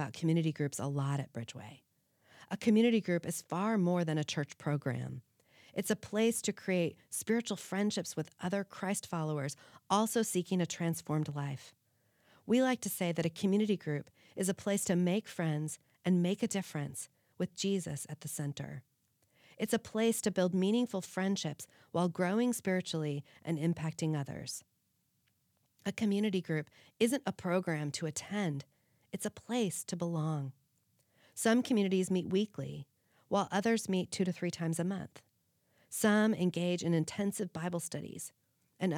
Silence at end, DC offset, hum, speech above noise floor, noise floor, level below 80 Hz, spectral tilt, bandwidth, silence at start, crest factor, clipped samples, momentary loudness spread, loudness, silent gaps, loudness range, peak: 0 s; under 0.1%; none; 44 dB; -78 dBFS; -78 dBFS; -5.5 dB/octave; 18.5 kHz; 0 s; 22 dB; under 0.1%; 12 LU; -34 LUFS; none; 4 LU; -14 dBFS